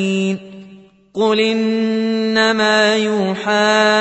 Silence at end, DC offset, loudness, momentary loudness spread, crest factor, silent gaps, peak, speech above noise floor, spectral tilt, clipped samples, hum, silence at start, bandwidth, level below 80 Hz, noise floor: 0 s; under 0.1%; -15 LUFS; 7 LU; 16 dB; none; 0 dBFS; 28 dB; -4.5 dB/octave; under 0.1%; none; 0 s; 8.4 kHz; -64 dBFS; -43 dBFS